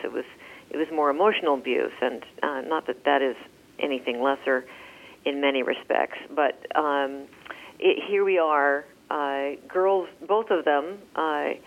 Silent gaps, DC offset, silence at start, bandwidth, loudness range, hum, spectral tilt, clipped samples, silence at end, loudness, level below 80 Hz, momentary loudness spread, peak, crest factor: none; under 0.1%; 0 s; 12.5 kHz; 3 LU; none; -4.5 dB/octave; under 0.1%; 0.05 s; -25 LUFS; -72 dBFS; 14 LU; -8 dBFS; 18 dB